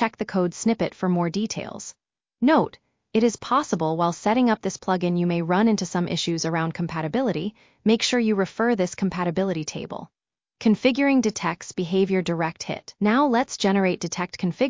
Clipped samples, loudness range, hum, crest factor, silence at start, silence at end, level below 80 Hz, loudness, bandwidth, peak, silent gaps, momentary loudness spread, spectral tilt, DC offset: under 0.1%; 2 LU; none; 16 dB; 0 s; 0 s; -60 dBFS; -23 LUFS; 7.6 kHz; -6 dBFS; none; 9 LU; -5.5 dB/octave; under 0.1%